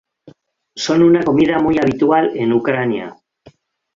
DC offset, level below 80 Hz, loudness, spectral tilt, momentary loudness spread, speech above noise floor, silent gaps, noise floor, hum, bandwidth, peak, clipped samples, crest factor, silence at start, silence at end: under 0.1%; -50 dBFS; -15 LUFS; -6 dB/octave; 13 LU; 34 dB; none; -49 dBFS; none; 7.6 kHz; -2 dBFS; under 0.1%; 14 dB; 0.25 s; 0.8 s